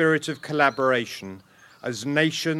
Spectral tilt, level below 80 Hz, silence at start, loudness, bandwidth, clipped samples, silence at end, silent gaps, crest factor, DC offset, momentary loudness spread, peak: -4.5 dB/octave; -70 dBFS; 0 s; -24 LUFS; 14.5 kHz; under 0.1%; 0 s; none; 20 dB; under 0.1%; 15 LU; -4 dBFS